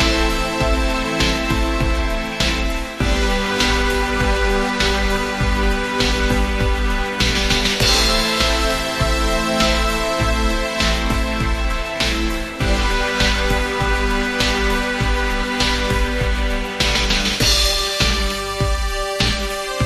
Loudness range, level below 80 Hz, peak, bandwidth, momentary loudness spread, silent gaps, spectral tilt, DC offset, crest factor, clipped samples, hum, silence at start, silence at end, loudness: 2 LU; -22 dBFS; -4 dBFS; 14 kHz; 5 LU; none; -3.5 dB/octave; under 0.1%; 14 dB; under 0.1%; none; 0 s; 0 s; -18 LUFS